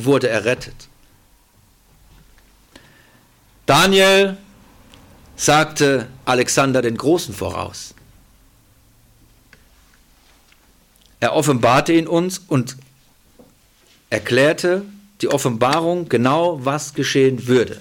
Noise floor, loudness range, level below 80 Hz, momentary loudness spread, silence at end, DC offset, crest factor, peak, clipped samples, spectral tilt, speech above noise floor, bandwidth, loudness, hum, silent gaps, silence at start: -54 dBFS; 10 LU; -50 dBFS; 12 LU; 0 s; under 0.1%; 16 dB; -2 dBFS; under 0.1%; -4.5 dB/octave; 37 dB; 17.5 kHz; -17 LUFS; none; none; 0 s